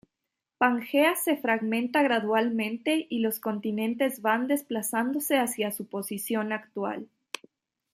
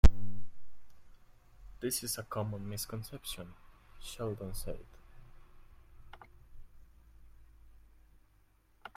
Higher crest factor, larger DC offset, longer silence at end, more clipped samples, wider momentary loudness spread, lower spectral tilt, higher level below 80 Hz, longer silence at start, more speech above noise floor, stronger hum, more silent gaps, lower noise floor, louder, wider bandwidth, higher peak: second, 20 dB vs 26 dB; neither; second, 0.9 s vs 2.35 s; neither; second, 10 LU vs 26 LU; second, -3.5 dB/octave vs -5 dB/octave; second, -78 dBFS vs -38 dBFS; first, 0.6 s vs 0.05 s; first, 59 dB vs 28 dB; neither; neither; first, -86 dBFS vs -67 dBFS; first, -27 LUFS vs -39 LUFS; about the same, 15.5 kHz vs 16 kHz; about the same, -8 dBFS vs -6 dBFS